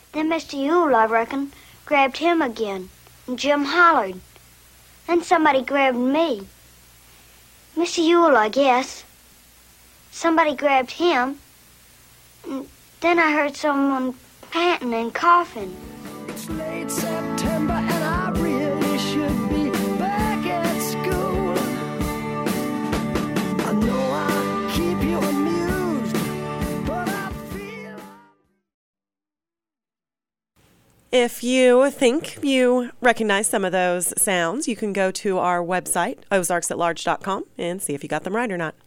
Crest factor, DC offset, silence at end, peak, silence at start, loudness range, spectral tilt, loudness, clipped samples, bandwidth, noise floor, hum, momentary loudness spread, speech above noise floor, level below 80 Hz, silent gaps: 18 dB; under 0.1%; 0.15 s; -4 dBFS; 0.15 s; 5 LU; -4.5 dB/octave; -21 LUFS; under 0.1%; 16.5 kHz; under -90 dBFS; none; 14 LU; over 70 dB; -44 dBFS; 28.74-28.93 s